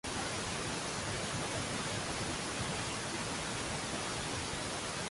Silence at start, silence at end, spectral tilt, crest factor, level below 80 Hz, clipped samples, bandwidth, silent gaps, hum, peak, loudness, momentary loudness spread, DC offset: 0.05 s; 0 s; -3 dB/octave; 14 dB; -54 dBFS; under 0.1%; 12 kHz; none; none; -24 dBFS; -37 LUFS; 1 LU; under 0.1%